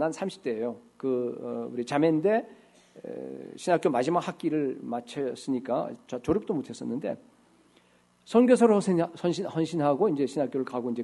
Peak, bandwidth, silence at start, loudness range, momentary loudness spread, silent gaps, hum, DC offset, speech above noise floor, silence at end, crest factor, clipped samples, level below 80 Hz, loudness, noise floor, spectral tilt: -8 dBFS; 11.5 kHz; 0 s; 6 LU; 12 LU; none; 60 Hz at -65 dBFS; under 0.1%; 36 dB; 0 s; 20 dB; under 0.1%; -66 dBFS; -28 LUFS; -63 dBFS; -6.5 dB/octave